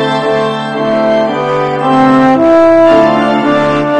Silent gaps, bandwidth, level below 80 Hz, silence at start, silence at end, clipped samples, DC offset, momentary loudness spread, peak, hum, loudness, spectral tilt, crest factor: none; 9.8 kHz; -44 dBFS; 0 s; 0 s; 0.4%; under 0.1%; 7 LU; 0 dBFS; none; -9 LUFS; -6.5 dB/octave; 8 dB